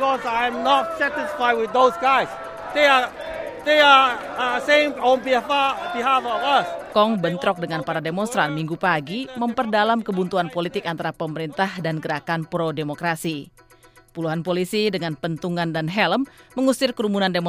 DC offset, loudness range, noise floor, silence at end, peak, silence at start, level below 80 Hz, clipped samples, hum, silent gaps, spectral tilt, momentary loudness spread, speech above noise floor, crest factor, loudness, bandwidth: under 0.1%; 8 LU; -52 dBFS; 0 s; -2 dBFS; 0 s; -58 dBFS; under 0.1%; none; none; -5 dB/octave; 10 LU; 31 dB; 20 dB; -21 LUFS; 15.5 kHz